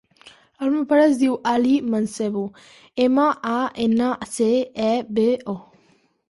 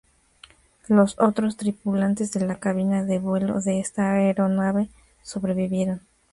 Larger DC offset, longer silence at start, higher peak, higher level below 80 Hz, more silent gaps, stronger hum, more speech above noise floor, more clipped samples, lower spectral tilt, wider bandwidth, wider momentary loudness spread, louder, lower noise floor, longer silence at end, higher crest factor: neither; second, 0.25 s vs 0.9 s; about the same, -6 dBFS vs -6 dBFS; about the same, -62 dBFS vs -58 dBFS; neither; neither; first, 40 dB vs 31 dB; neither; second, -5.5 dB/octave vs -7 dB/octave; about the same, 11.5 kHz vs 11.5 kHz; about the same, 10 LU vs 8 LU; about the same, -21 LUFS vs -23 LUFS; first, -60 dBFS vs -53 dBFS; first, 0.7 s vs 0.35 s; about the same, 14 dB vs 18 dB